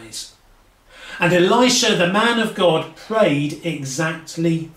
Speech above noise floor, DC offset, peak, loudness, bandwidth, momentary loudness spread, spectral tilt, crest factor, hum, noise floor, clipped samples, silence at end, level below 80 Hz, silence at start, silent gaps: 35 dB; under 0.1%; -4 dBFS; -18 LUFS; 15.5 kHz; 13 LU; -4 dB/octave; 16 dB; none; -53 dBFS; under 0.1%; 0.05 s; -56 dBFS; 0 s; none